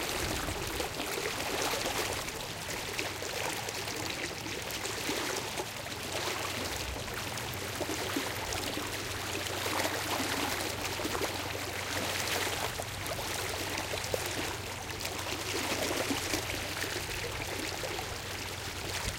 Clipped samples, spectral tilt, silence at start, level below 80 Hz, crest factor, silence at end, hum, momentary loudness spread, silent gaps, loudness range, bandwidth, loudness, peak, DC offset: under 0.1%; -2.5 dB/octave; 0 s; -52 dBFS; 20 dB; 0 s; none; 5 LU; none; 2 LU; 17 kHz; -34 LUFS; -14 dBFS; under 0.1%